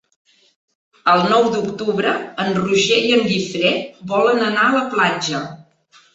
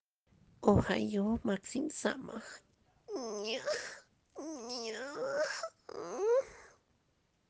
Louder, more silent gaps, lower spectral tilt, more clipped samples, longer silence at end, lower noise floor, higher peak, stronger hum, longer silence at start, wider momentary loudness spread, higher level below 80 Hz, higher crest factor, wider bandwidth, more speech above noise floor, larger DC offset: first, -17 LUFS vs -36 LUFS; neither; about the same, -4 dB/octave vs -5 dB/octave; neither; second, 0.5 s vs 0.8 s; second, -53 dBFS vs -76 dBFS; first, -2 dBFS vs -14 dBFS; neither; first, 1.05 s vs 0.6 s; second, 8 LU vs 17 LU; about the same, -60 dBFS vs -60 dBFS; second, 16 dB vs 24 dB; second, 8 kHz vs 9.8 kHz; second, 36 dB vs 41 dB; neither